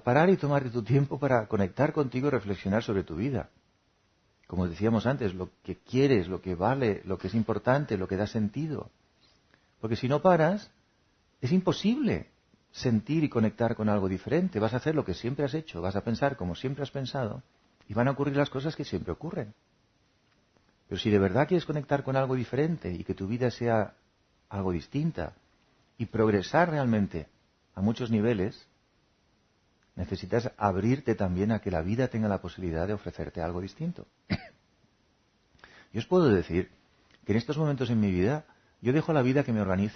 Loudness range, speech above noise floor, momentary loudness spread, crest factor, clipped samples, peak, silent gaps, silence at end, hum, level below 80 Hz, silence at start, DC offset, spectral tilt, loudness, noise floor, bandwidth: 4 LU; 42 dB; 12 LU; 20 dB; under 0.1%; -8 dBFS; none; 0 s; none; -54 dBFS; 0.05 s; under 0.1%; -8 dB/octave; -29 LUFS; -69 dBFS; 6.6 kHz